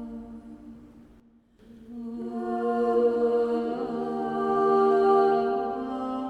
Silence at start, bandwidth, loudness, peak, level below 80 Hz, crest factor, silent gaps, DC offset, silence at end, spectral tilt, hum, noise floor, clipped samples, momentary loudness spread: 0 s; 7.8 kHz; -25 LUFS; -10 dBFS; -60 dBFS; 16 dB; none; under 0.1%; 0 s; -7.5 dB/octave; none; -57 dBFS; under 0.1%; 21 LU